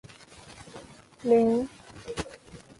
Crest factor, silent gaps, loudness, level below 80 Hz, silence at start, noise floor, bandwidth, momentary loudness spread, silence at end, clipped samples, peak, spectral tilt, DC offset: 18 dB; none; -27 LUFS; -56 dBFS; 0.45 s; -50 dBFS; 11.5 kHz; 26 LU; 0.25 s; under 0.1%; -12 dBFS; -6 dB/octave; under 0.1%